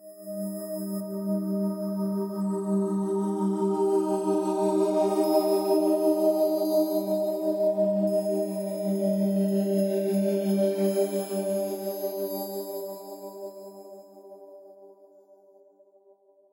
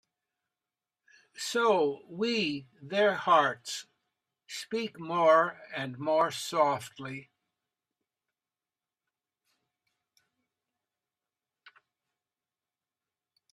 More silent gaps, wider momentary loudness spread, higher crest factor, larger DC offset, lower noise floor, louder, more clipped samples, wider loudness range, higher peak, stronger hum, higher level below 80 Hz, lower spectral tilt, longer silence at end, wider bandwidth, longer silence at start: neither; second, 14 LU vs 17 LU; second, 16 dB vs 22 dB; neither; second, -60 dBFS vs under -90 dBFS; about the same, -27 LUFS vs -29 LUFS; neither; first, 12 LU vs 8 LU; about the same, -10 dBFS vs -10 dBFS; neither; second, -88 dBFS vs -82 dBFS; first, -7 dB/octave vs -4 dB/octave; second, 1.6 s vs 6.3 s; first, 16.5 kHz vs 14 kHz; second, 0 s vs 1.4 s